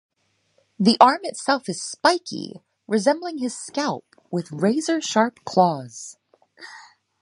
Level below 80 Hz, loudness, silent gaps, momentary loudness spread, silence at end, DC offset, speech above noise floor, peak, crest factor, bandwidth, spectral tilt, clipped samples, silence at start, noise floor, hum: -72 dBFS; -22 LUFS; none; 20 LU; 0.4 s; under 0.1%; 45 dB; 0 dBFS; 22 dB; 11.5 kHz; -4.5 dB/octave; under 0.1%; 0.8 s; -67 dBFS; none